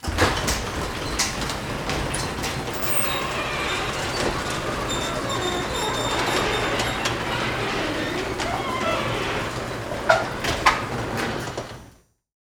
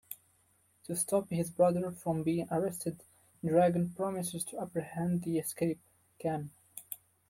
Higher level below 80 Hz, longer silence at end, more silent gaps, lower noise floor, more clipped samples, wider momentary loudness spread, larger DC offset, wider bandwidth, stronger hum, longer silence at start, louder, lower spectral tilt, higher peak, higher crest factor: first, -38 dBFS vs -70 dBFS; first, 0.5 s vs 0.35 s; neither; second, -52 dBFS vs -70 dBFS; neither; second, 7 LU vs 17 LU; neither; first, over 20 kHz vs 16.5 kHz; neither; about the same, 0 s vs 0.1 s; first, -24 LUFS vs -33 LUFS; second, -3.5 dB/octave vs -6 dB/octave; first, 0 dBFS vs -16 dBFS; first, 24 dB vs 18 dB